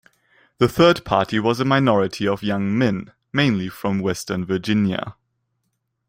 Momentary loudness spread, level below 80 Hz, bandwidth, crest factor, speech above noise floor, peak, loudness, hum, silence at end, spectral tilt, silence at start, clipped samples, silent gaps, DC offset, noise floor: 9 LU; -52 dBFS; 16.5 kHz; 20 dB; 54 dB; -2 dBFS; -20 LUFS; none; 0.95 s; -6 dB/octave; 0.6 s; under 0.1%; none; under 0.1%; -74 dBFS